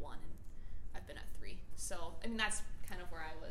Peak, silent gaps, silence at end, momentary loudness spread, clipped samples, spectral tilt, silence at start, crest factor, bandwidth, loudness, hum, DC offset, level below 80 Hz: -22 dBFS; none; 0 s; 17 LU; under 0.1%; -2.5 dB/octave; 0 s; 16 dB; 15 kHz; -45 LUFS; none; under 0.1%; -48 dBFS